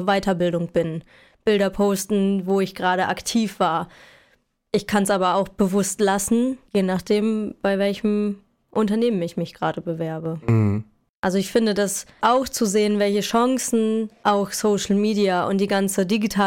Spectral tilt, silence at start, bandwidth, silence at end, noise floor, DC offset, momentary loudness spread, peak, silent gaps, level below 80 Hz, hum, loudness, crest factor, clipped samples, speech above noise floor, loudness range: -5 dB/octave; 0 s; 17 kHz; 0 s; -63 dBFS; under 0.1%; 7 LU; -8 dBFS; 11.09-11.23 s; -52 dBFS; none; -22 LUFS; 14 dB; under 0.1%; 42 dB; 3 LU